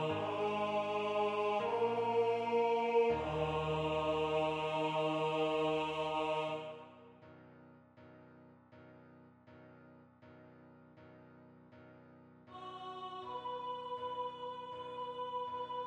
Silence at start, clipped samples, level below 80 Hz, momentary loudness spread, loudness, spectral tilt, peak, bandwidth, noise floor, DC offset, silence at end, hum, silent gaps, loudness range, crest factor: 0 s; under 0.1%; -66 dBFS; 13 LU; -36 LUFS; -6 dB/octave; -20 dBFS; 9.6 kHz; -61 dBFS; under 0.1%; 0 s; none; none; 17 LU; 18 dB